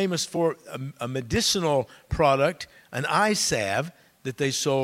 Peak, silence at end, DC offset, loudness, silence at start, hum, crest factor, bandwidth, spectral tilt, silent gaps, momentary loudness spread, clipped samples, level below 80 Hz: -8 dBFS; 0 s; under 0.1%; -25 LUFS; 0 s; none; 18 dB; 16.5 kHz; -3.5 dB/octave; none; 15 LU; under 0.1%; -48 dBFS